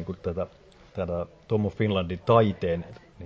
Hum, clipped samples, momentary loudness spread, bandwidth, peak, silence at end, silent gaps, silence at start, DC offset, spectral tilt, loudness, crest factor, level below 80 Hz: none; under 0.1%; 14 LU; 7.4 kHz; -6 dBFS; 0 s; none; 0 s; under 0.1%; -9 dB/octave; -27 LUFS; 22 dB; -46 dBFS